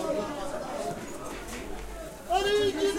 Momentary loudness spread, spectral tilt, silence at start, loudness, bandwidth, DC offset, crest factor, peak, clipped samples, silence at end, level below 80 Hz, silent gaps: 14 LU; -3.5 dB/octave; 0 s; -32 LUFS; 16 kHz; under 0.1%; 16 dB; -14 dBFS; under 0.1%; 0 s; -46 dBFS; none